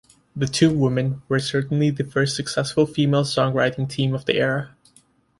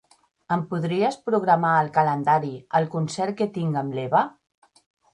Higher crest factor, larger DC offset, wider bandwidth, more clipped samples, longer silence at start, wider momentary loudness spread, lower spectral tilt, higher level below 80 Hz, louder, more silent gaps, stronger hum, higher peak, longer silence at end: about the same, 18 dB vs 18 dB; neither; about the same, 11.5 kHz vs 11 kHz; neither; second, 0.35 s vs 0.5 s; about the same, 6 LU vs 7 LU; about the same, -5.5 dB/octave vs -6.5 dB/octave; first, -54 dBFS vs -68 dBFS; about the same, -21 LUFS vs -23 LUFS; neither; neither; about the same, -4 dBFS vs -4 dBFS; second, 0.7 s vs 0.85 s